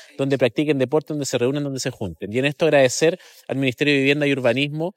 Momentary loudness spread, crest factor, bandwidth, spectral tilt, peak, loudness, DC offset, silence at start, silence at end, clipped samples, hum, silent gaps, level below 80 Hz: 10 LU; 16 dB; 16 kHz; -5 dB/octave; -4 dBFS; -20 LUFS; under 0.1%; 0 s; 0.05 s; under 0.1%; none; none; -60 dBFS